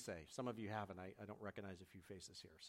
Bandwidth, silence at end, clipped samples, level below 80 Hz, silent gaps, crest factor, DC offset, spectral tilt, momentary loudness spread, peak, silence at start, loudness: 16 kHz; 0 s; under 0.1%; -78 dBFS; none; 20 dB; under 0.1%; -5 dB/octave; 9 LU; -32 dBFS; 0 s; -52 LUFS